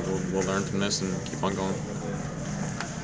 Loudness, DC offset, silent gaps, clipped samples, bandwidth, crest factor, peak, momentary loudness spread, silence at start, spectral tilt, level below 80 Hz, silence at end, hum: -30 LUFS; under 0.1%; none; under 0.1%; 8 kHz; 18 dB; -12 dBFS; 6 LU; 0 s; -4.5 dB/octave; -48 dBFS; 0 s; none